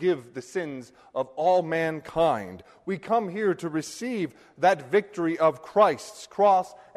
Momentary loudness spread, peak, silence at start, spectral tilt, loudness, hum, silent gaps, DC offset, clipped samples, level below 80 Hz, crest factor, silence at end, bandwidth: 13 LU; -8 dBFS; 0 s; -5.5 dB/octave; -26 LUFS; none; none; under 0.1%; under 0.1%; -64 dBFS; 18 dB; 0.15 s; 13.5 kHz